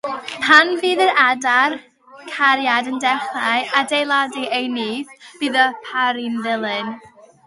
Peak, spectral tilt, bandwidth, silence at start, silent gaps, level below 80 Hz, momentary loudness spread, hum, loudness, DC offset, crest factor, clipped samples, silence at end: 0 dBFS; -2.5 dB/octave; 11.5 kHz; 0.05 s; none; -70 dBFS; 13 LU; none; -17 LUFS; under 0.1%; 18 dB; under 0.1%; 0.4 s